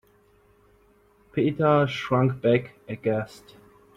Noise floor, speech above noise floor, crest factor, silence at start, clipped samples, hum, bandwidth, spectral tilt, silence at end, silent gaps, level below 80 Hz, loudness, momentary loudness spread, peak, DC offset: -60 dBFS; 36 dB; 20 dB; 1.35 s; under 0.1%; none; 10.5 kHz; -8 dB/octave; 0.6 s; none; -60 dBFS; -24 LUFS; 12 LU; -8 dBFS; under 0.1%